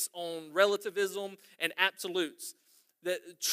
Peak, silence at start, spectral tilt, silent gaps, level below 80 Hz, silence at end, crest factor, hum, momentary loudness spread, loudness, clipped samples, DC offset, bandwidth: -10 dBFS; 0 s; -1.5 dB/octave; none; under -90 dBFS; 0 s; 24 dB; none; 13 LU; -32 LUFS; under 0.1%; under 0.1%; 15.5 kHz